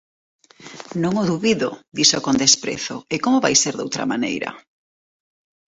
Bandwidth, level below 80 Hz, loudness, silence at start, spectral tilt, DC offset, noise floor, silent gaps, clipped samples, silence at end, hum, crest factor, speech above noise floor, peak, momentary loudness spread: 8.2 kHz; -58 dBFS; -19 LUFS; 0.6 s; -2.5 dB/octave; under 0.1%; -40 dBFS; none; under 0.1%; 1.15 s; none; 22 dB; 20 dB; 0 dBFS; 12 LU